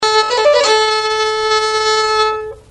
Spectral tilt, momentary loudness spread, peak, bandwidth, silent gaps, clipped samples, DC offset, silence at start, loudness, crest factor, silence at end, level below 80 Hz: 0 dB/octave; 4 LU; -2 dBFS; 10.5 kHz; none; under 0.1%; under 0.1%; 0 s; -13 LUFS; 12 dB; 0.1 s; -48 dBFS